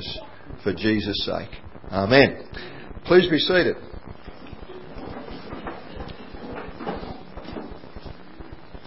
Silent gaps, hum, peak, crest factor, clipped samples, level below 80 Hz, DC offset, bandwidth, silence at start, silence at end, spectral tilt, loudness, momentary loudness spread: none; none; 0 dBFS; 26 dB; under 0.1%; -44 dBFS; 0.8%; 5.8 kHz; 0 s; 0 s; -9.5 dB/octave; -22 LUFS; 24 LU